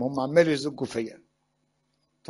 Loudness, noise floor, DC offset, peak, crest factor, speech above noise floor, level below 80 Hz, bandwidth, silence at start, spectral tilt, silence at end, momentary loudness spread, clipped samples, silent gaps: -25 LUFS; -74 dBFS; under 0.1%; -6 dBFS; 22 dB; 48 dB; -66 dBFS; 11.5 kHz; 0 s; -6 dB/octave; 1.15 s; 12 LU; under 0.1%; none